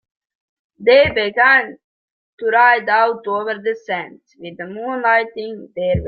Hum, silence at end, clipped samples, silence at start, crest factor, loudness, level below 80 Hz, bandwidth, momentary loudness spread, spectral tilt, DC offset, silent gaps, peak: none; 0 s; under 0.1%; 0.8 s; 16 dB; -16 LUFS; -46 dBFS; 6 kHz; 18 LU; -7 dB/octave; under 0.1%; 1.84-2.38 s; -2 dBFS